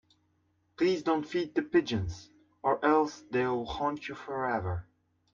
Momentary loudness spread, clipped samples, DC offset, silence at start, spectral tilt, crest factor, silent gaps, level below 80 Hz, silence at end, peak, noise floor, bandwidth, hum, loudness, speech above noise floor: 11 LU; under 0.1%; under 0.1%; 0.8 s; -6.5 dB/octave; 18 dB; none; -58 dBFS; 0.5 s; -14 dBFS; -73 dBFS; 7.4 kHz; none; -31 LUFS; 43 dB